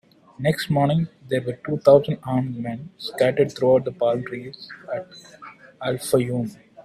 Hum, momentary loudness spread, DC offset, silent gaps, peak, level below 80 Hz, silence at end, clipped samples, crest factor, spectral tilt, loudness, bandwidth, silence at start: none; 16 LU; under 0.1%; none; -2 dBFS; -60 dBFS; 0.05 s; under 0.1%; 20 dB; -6.5 dB/octave; -22 LUFS; 15 kHz; 0.4 s